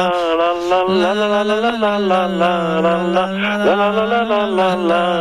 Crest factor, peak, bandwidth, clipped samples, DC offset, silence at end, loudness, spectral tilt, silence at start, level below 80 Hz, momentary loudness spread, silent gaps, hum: 10 dB; -6 dBFS; 13.5 kHz; under 0.1%; 0.3%; 0 s; -16 LUFS; -6 dB/octave; 0 s; -52 dBFS; 2 LU; none; none